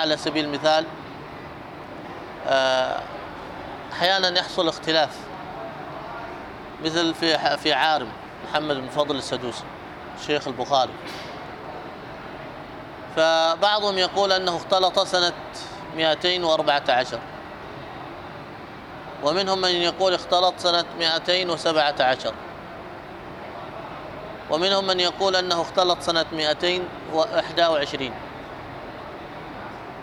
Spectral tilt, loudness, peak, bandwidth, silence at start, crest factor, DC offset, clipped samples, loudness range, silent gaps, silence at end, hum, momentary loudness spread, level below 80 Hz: -3.5 dB/octave; -22 LUFS; -6 dBFS; 14.5 kHz; 0 s; 18 dB; under 0.1%; under 0.1%; 5 LU; none; 0 s; none; 17 LU; -56 dBFS